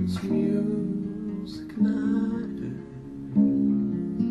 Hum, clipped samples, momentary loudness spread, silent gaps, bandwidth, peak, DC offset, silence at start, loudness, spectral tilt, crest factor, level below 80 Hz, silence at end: none; under 0.1%; 13 LU; none; 10.5 kHz; -10 dBFS; under 0.1%; 0 s; -27 LUFS; -9 dB/octave; 16 dB; -54 dBFS; 0 s